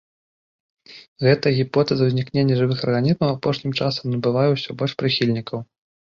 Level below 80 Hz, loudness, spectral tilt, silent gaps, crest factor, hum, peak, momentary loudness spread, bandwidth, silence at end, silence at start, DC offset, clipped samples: -56 dBFS; -20 LUFS; -7.5 dB/octave; 1.08-1.16 s; 18 dB; none; -4 dBFS; 5 LU; 7 kHz; 0.5 s; 0.9 s; under 0.1%; under 0.1%